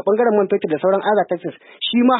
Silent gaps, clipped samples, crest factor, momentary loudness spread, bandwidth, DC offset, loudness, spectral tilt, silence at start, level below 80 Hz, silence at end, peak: none; under 0.1%; 14 dB; 10 LU; 4.1 kHz; under 0.1%; -18 LUFS; -10.5 dB/octave; 0.05 s; -70 dBFS; 0 s; -4 dBFS